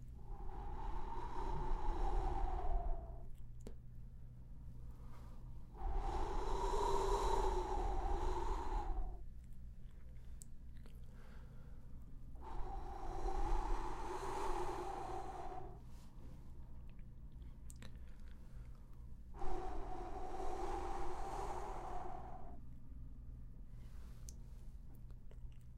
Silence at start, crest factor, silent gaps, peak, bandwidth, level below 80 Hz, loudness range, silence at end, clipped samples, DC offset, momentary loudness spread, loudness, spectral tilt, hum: 0 s; 18 dB; none; -24 dBFS; 11.5 kHz; -44 dBFS; 15 LU; 0 s; under 0.1%; under 0.1%; 15 LU; -46 LUFS; -6 dB/octave; none